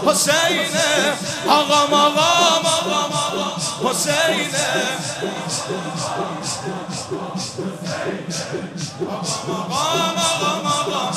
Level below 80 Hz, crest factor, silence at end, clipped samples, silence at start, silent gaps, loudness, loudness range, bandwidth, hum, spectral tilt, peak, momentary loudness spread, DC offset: -60 dBFS; 20 dB; 0 s; under 0.1%; 0 s; none; -19 LUFS; 9 LU; 15 kHz; none; -2.5 dB/octave; 0 dBFS; 12 LU; under 0.1%